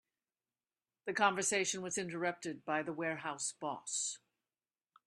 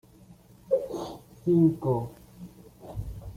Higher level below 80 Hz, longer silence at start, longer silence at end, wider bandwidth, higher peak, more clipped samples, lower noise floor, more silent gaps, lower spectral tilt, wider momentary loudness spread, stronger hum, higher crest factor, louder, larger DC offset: second, -84 dBFS vs -50 dBFS; first, 1.05 s vs 0.3 s; first, 0.9 s vs 0 s; second, 13 kHz vs 15.5 kHz; second, -16 dBFS vs -10 dBFS; neither; first, under -90 dBFS vs -54 dBFS; neither; second, -2.5 dB/octave vs -9.5 dB/octave; second, 10 LU vs 25 LU; neither; first, 24 dB vs 18 dB; second, -37 LUFS vs -27 LUFS; neither